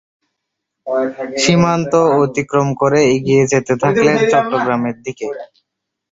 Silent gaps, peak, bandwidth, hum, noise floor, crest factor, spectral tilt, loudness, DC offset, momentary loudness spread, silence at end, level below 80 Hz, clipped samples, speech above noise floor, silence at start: none; 0 dBFS; 8 kHz; none; -77 dBFS; 14 dB; -5.5 dB/octave; -14 LUFS; under 0.1%; 12 LU; 0.65 s; -50 dBFS; under 0.1%; 62 dB; 0.85 s